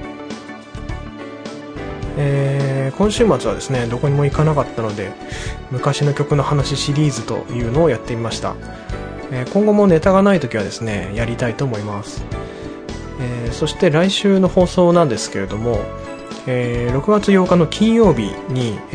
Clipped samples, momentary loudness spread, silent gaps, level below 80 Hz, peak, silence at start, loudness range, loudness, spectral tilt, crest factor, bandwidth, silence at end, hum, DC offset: under 0.1%; 17 LU; none; -34 dBFS; -2 dBFS; 0 s; 3 LU; -17 LUFS; -6.5 dB/octave; 16 dB; 10.5 kHz; 0 s; none; under 0.1%